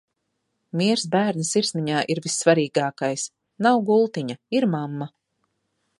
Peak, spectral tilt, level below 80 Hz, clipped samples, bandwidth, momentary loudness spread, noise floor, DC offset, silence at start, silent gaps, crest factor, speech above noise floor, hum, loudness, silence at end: -4 dBFS; -4.5 dB/octave; -72 dBFS; under 0.1%; 11.5 kHz; 12 LU; -76 dBFS; under 0.1%; 0.75 s; none; 20 dB; 54 dB; none; -22 LUFS; 0.95 s